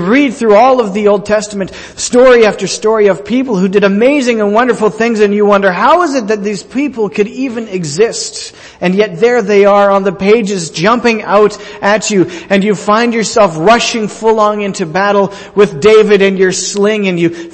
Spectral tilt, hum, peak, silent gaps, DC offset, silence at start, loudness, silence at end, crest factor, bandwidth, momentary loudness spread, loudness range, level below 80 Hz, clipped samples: -4.5 dB/octave; none; 0 dBFS; none; under 0.1%; 0 s; -10 LUFS; 0 s; 10 dB; 8.8 kHz; 9 LU; 2 LU; -46 dBFS; 0.1%